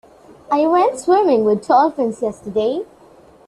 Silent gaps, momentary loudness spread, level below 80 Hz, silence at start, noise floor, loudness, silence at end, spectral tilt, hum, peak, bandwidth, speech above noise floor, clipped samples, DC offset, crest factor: none; 9 LU; -58 dBFS; 0.5 s; -46 dBFS; -17 LUFS; 0.65 s; -5.5 dB/octave; none; -2 dBFS; 12 kHz; 31 dB; under 0.1%; under 0.1%; 14 dB